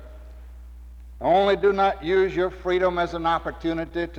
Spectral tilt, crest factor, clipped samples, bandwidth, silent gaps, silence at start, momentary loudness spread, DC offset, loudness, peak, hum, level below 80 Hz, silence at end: -6.5 dB/octave; 16 dB; under 0.1%; 7.8 kHz; none; 0 s; 8 LU; under 0.1%; -23 LUFS; -8 dBFS; 60 Hz at -40 dBFS; -42 dBFS; 0 s